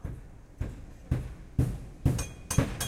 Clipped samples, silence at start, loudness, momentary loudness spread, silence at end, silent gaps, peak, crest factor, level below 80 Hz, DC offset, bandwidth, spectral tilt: under 0.1%; 0 s; -33 LUFS; 15 LU; 0 s; none; -10 dBFS; 22 dB; -40 dBFS; under 0.1%; 16.5 kHz; -5.5 dB/octave